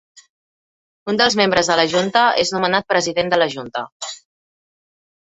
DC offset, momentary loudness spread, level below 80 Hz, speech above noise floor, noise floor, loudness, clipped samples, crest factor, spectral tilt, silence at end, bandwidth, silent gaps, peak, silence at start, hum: under 0.1%; 15 LU; -56 dBFS; over 73 dB; under -90 dBFS; -17 LUFS; under 0.1%; 18 dB; -3 dB/octave; 1.05 s; 8.2 kHz; 0.29-1.06 s, 3.92-4.00 s; -2 dBFS; 0.15 s; none